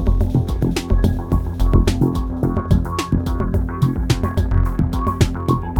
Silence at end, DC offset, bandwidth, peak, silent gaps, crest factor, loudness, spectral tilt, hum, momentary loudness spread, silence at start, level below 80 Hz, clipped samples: 0 s; under 0.1%; 17 kHz; -2 dBFS; none; 16 dB; -19 LUFS; -7 dB/octave; none; 3 LU; 0 s; -22 dBFS; under 0.1%